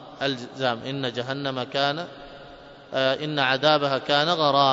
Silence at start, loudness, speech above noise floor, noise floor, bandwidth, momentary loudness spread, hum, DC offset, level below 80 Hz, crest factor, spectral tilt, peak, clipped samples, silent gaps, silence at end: 0 s; -24 LUFS; 21 dB; -45 dBFS; 7.8 kHz; 13 LU; none; under 0.1%; -62 dBFS; 20 dB; -5 dB/octave; -4 dBFS; under 0.1%; none; 0 s